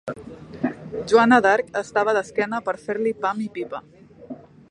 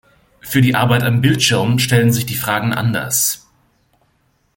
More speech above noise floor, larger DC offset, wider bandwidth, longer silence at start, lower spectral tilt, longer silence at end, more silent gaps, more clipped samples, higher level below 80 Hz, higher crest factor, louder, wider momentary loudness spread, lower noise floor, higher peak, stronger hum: second, 20 dB vs 46 dB; neither; second, 10.5 kHz vs 17 kHz; second, 0.05 s vs 0.45 s; about the same, -5 dB/octave vs -4.5 dB/octave; second, 0.35 s vs 1.2 s; neither; neither; second, -60 dBFS vs -48 dBFS; about the same, 20 dB vs 16 dB; second, -21 LUFS vs -15 LUFS; first, 24 LU vs 5 LU; second, -40 dBFS vs -61 dBFS; about the same, -2 dBFS vs -2 dBFS; neither